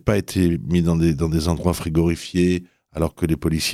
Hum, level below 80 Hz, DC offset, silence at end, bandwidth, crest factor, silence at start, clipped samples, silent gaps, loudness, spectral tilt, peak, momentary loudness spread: none; -38 dBFS; under 0.1%; 0 s; 15 kHz; 16 dB; 0.05 s; under 0.1%; none; -21 LUFS; -6 dB/octave; -4 dBFS; 6 LU